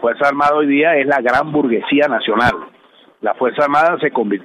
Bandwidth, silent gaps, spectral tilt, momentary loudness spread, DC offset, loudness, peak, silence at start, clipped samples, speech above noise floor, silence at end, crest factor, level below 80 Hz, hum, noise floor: 10.5 kHz; none; -6 dB/octave; 5 LU; under 0.1%; -15 LUFS; -2 dBFS; 0 s; under 0.1%; 34 dB; 0 s; 14 dB; -48 dBFS; none; -49 dBFS